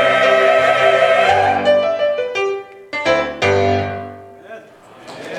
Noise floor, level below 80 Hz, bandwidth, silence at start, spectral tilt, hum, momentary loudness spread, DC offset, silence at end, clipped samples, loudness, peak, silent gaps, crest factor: -41 dBFS; -54 dBFS; 12 kHz; 0 s; -4.5 dB/octave; none; 14 LU; under 0.1%; 0 s; under 0.1%; -15 LUFS; -2 dBFS; none; 14 dB